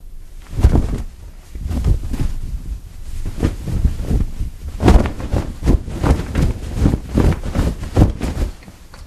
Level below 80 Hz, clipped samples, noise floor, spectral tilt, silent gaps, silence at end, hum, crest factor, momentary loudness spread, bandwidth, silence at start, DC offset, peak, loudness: -20 dBFS; under 0.1%; -37 dBFS; -7.5 dB/octave; none; 0 s; none; 18 dB; 15 LU; 14 kHz; 0 s; under 0.1%; 0 dBFS; -20 LUFS